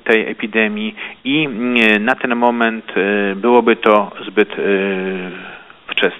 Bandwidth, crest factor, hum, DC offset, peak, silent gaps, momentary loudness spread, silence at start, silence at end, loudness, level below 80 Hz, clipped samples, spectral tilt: 9.4 kHz; 16 dB; none; under 0.1%; 0 dBFS; none; 13 LU; 0.05 s; 0 s; -15 LUFS; -62 dBFS; under 0.1%; -6.5 dB/octave